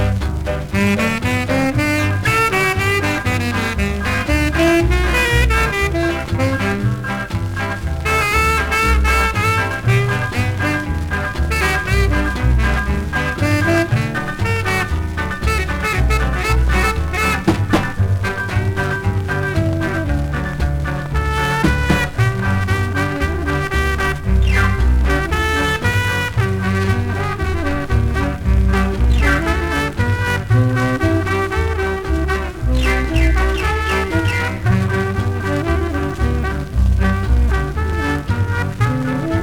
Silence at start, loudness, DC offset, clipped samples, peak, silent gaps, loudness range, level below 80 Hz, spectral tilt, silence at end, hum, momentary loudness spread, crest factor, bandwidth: 0 s; -17 LUFS; under 0.1%; under 0.1%; -2 dBFS; none; 2 LU; -22 dBFS; -6 dB/octave; 0 s; none; 5 LU; 14 dB; 18 kHz